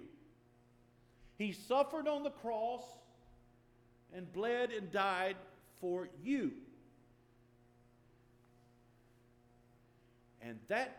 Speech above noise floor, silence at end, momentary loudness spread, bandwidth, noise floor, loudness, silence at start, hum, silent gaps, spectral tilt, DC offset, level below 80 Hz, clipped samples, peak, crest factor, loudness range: 30 dB; 0 s; 20 LU; 19 kHz; -68 dBFS; -39 LUFS; 0 s; none; none; -5 dB/octave; under 0.1%; -74 dBFS; under 0.1%; -20 dBFS; 22 dB; 7 LU